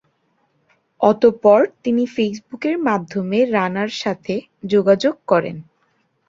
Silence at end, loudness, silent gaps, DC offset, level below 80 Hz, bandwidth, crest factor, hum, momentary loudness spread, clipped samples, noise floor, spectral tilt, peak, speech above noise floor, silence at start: 0.65 s; -18 LUFS; none; under 0.1%; -62 dBFS; 7.6 kHz; 18 dB; none; 11 LU; under 0.1%; -65 dBFS; -6.5 dB/octave; -2 dBFS; 47 dB; 1 s